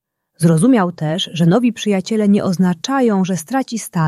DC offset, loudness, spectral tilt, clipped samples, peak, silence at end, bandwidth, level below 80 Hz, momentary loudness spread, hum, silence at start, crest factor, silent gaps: under 0.1%; -16 LUFS; -6 dB/octave; under 0.1%; -2 dBFS; 0 s; 13 kHz; -58 dBFS; 7 LU; none; 0.4 s; 14 dB; none